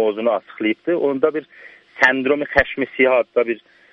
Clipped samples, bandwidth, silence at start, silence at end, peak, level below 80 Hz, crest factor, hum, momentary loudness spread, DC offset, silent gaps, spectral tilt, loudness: under 0.1%; 7.4 kHz; 0 s; 0.35 s; 0 dBFS; -46 dBFS; 20 dB; none; 7 LU; under 0.1%; none; -5.5 dB/octave; -18 LUFS